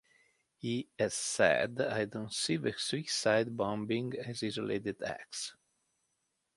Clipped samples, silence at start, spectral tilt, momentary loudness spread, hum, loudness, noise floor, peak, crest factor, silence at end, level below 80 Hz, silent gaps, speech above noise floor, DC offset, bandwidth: under 0.1%; 0.65 s; -3.5 dB/octave; 11 LU; none; -34 LUFS; -82 dBFS; -12 dBFS; 22 dB; 1.05 s; -70 dBFS; none; 48 dB; under 0.1%; 11.5 kHz